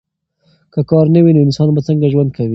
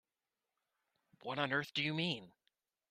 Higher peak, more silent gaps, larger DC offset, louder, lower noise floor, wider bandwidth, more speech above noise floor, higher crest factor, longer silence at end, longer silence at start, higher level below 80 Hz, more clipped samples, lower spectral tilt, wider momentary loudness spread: first, 0 dBFS vs -20 dBFS; neither; neither; first, -12 LUFS vs -38 LUFS; second, -58 dBFS vs under -90 dBFS; second, 7.4 kHz vs 14 kHz; second, 47 dB vs over 51 dB; second, 12 dB vs 24 dB; second, 0 s vs 0.6 s; second, 0.75 s vs 1.25 s; first, -48 dBFS vs -80 dBFS; neither; first, -9.5 dB/octave vs -5 dB/octave; about the same, 8 LU vs 9 LU